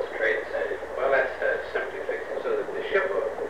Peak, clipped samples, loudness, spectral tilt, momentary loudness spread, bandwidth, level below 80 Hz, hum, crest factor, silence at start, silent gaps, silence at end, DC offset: -12 dBFS; under 0.1%; -27 LUFS; -4.5 dB/octave; 7 LU; 12 kHz; -58 dBFS; none; 16 dB; 0 s; none; 0 s; 0.4%